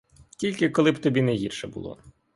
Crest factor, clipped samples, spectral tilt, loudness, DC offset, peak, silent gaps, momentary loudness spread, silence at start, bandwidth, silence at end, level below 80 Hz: 18 dB; under 0.1%; -6 dB/octave; -24 LUFS; under 0.1%; -8 dBFS; none; 15 LU; 0.4 s; 11.5 kHz; 0.25 s; -58 dBFS